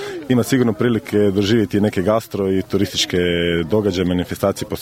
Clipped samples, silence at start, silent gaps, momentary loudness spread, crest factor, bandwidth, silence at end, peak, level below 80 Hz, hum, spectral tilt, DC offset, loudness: under 0.1%; 0 s; none; 4 LU; 16 dB; 16.5 kHz; 0 s; -2 dBFS; -46 dBFS; none; -5.5 dB/octave; under 0.1%; -18 LUFS